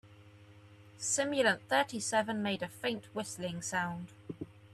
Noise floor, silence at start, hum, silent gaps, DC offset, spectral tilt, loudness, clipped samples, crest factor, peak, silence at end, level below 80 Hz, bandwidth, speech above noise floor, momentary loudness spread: -57 dBFS; 0.05 s; none; none; under 0.1%; -3 dB/octave; -33 LUFS; under 0.1%; 20 dB; -14 dBFS; 0 s; -72 dBFS; 14 kHz; 23 dB; 16 LU